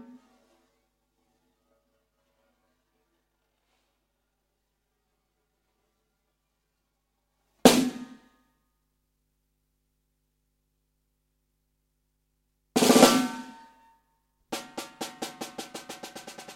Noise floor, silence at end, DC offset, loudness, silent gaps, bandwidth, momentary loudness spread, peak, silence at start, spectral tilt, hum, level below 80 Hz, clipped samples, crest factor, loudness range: -78 dBFS; 0.05 s; under 0.1%; -22 LUFS; none; 16.5 kHz; 23 LU; -2 dBFS; 7.65 s; -3 dB/octave; 50 Hz at -65 dBFS; -66 dBFS; under 0.1%; 30 dB; 9 LU